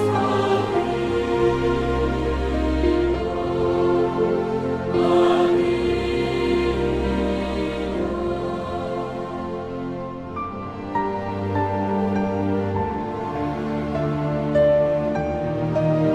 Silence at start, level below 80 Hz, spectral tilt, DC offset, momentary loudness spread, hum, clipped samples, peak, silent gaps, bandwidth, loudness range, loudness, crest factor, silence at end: 0 s; -36 dBFS; -7.5 dB/octave; under 0.1%; 9 LU; none; under 0.1%; -6 dBFS; none; 10.5 kHz; 7 LU; -22 LUFS; 16 dB; 0 s